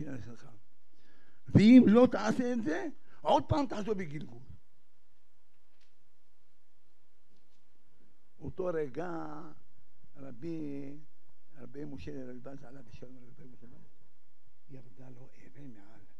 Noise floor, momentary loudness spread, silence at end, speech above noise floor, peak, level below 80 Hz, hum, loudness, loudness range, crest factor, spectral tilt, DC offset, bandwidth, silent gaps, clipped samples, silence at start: -77 dBFS; 27 LU; 0.45 s; 47 dB; -10 dBFS; -60 dBFS; none; -28 LUFS; 23 LU; 24 dB; -7.5 dB/octave; 1%; 8.4 kHz; none; under 0.1%; 0 s